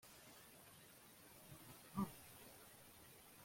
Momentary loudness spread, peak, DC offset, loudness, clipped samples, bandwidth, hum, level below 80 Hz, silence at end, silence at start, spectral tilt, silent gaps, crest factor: 14 LU; -32 dBFS; under 0.1%; -56 LUFS; under 0.1%; 16.5 kHz; none; -78 dBFS; 0 s; 0 s; -5 dB/octave; none; 24 dB